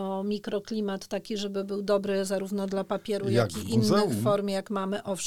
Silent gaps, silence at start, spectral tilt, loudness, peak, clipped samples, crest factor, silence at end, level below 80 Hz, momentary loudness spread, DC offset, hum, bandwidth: none; 0 s; -5.5 dB/octave; -29 LUFS; -10 dBFS; under 0.1%; 18 dB; 0 s; -64 dBFS; 8 LU; 0.2%; none; 16.5 kHz